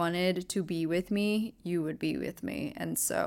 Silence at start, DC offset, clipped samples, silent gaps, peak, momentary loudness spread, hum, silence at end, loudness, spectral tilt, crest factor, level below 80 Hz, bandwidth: 0 s; under 0.1%; under 0.1%; none; -16 dBFS; 7 LU; none; 0 s; -32 LUFS; -4.5 dB/octave; 16 dB; -62 dBFS; 17 kHz